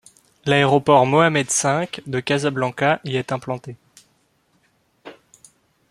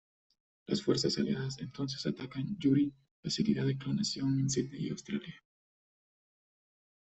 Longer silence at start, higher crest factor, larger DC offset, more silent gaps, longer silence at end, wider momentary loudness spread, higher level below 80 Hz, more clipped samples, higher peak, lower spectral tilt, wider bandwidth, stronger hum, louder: second, 0.45 s vs 0.7 s; about the same, 20 dB vs 20 dB; neither; second, none vs 3.11-3.23 s; second, 0.8 s vs 1.7 s; first, 13 LU vs 9 LU; first, -60 dBFS vs -66 dBFS; neither; first, -2 dBFS vs -16 dBFS; about the same, -4.5 dB/octave vs -5.5 dB/octave; first, 13.5 kHz vs 8.4 kHz; neither; first, -19 LUFS vs -34 LUFS